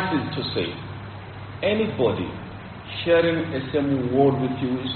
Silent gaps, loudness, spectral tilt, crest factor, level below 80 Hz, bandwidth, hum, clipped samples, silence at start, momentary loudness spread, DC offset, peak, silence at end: none; -23 LUFS; -5 dB/octave; 18 dB; -50 dBFS; 4.5 kHz; none; under 0.1%; 0 s; 17 LU; under 0.1%; -6 dBFS; 0 s